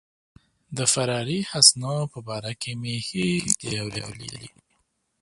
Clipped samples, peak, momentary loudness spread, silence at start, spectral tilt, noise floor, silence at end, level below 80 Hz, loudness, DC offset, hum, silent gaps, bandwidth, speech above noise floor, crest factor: under 0.1%; 0 dBFS; 20 LU; 0.7 s; -2.5 dB/octave; -71 dBFS; 0.75 s; -58 dBFS; -23 LUFS; under 0.1%; none; none; 11.5 kHz; 46 dB; 26 dB